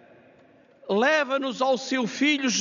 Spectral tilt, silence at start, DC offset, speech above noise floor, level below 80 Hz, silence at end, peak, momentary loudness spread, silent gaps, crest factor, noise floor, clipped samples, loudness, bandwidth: -1.5 dB/octave; 0.85 s; under 0.1%; 32 dB; -76 dBFS; 0 s; -8 dBFS; 6 LU; none; 18 dB; -56 dBFS; under 0.1%; -24 LUFS; 7.4 kHz